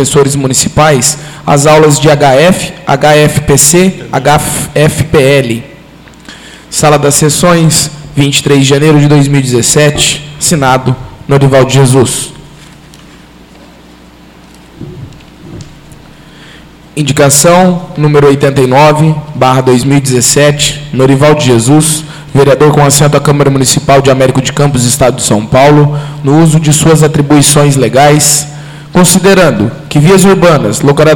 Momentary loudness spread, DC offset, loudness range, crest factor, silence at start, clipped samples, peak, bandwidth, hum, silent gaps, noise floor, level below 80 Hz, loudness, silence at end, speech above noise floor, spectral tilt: 7 LU; under 0.1%; 4 LU; 6 dB; 0 s; 3%; 0 dBFS; over 20 kHz; none; none; -34 dBFS; -32 dBFS; -6 LUFS; 0 s; 29 dB; -4.5 dB/octave